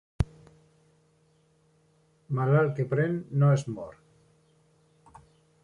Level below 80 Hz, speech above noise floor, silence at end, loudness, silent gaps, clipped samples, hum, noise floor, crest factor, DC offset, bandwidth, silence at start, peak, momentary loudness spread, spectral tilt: -50 dBFS; 40 dB; 1.75 s; -27 LUFS; none; under 0.1%; none; -66 dBFS; 20 dB; under 0.1%; 9.8 kHz; 0.2 s; -12 dBFS; 14 LU; -8.5 dB/octave